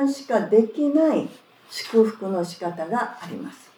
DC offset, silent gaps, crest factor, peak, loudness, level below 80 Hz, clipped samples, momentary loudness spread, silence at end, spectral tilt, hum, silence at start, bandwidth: under 0.1%; none; 18 dB; -4 dBFS; -22 LUFS; -86 dBFS; under 0.1%; 16 LU; 0.25 s; -6 dB/octave; none; 0 s; 18 kHz